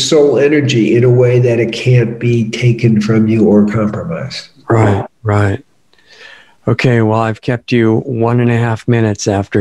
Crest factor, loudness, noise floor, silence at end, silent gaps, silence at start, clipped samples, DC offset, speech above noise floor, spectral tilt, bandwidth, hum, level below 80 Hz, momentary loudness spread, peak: 12 dB; -12 LUFS; -47 dBFS; 0 s; none; 0 s; under 0.1%; under 0.1%; 36 dB; -6.5 dB/octave; 10 kHz; none; -48 dBFS; 8 LU; 0 dBFS